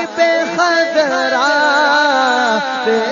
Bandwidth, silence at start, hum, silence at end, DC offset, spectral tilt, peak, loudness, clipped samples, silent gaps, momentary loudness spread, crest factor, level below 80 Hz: 7.4 kHz; 0 s; none; 0 s; under 0.1%; -2.5 dB/octave; 0 dBFS; -13 LUFS; under 0.1%; none; 4 LU; 14 dB; -66 dBFS